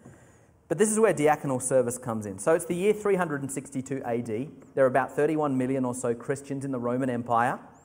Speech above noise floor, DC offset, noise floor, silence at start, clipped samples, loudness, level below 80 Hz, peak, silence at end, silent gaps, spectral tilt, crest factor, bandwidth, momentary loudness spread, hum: 31 dB; under 0.1%; -57 dBFS; 0.05 s; under 0.1%; -27 LUFS; -66 dBFS; -10 dBFS; 0.15 s; none; -5.5 dB/octave; 18 dB; 16 kHz; 10 LU; none